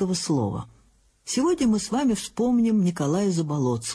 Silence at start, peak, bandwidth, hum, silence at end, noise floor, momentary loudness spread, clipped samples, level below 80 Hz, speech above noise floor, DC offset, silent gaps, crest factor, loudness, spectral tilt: 0 s; -12 dBFS; 11 kHz; none; 0 s; -60 dBFS; 8 LU; under 0.1%; -54 dBFS; 37 dB; under 0.1%; none; 12 dB; -24 LUFS; -5.5 dB/octave